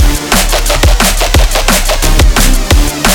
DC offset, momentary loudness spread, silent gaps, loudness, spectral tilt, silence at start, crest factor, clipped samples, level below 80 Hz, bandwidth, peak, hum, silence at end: under 0.1%; 2 LU; none; -9 LUFS; -3 dB/octave; 0 s; 8 dB; 0.3%; -10 dBFS; 19 kHz; 0 dBFS; none; 0 s